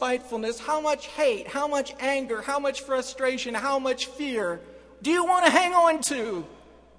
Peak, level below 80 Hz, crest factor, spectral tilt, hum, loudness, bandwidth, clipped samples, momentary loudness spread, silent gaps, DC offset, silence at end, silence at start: -4 dBFS; -60 dBFS; 22 dB; -2 dB/octave; none; -25 LUFS; 11 kHz; under 0.1%; 11 LU; none; under 0.1%; 0.4 s; 0 s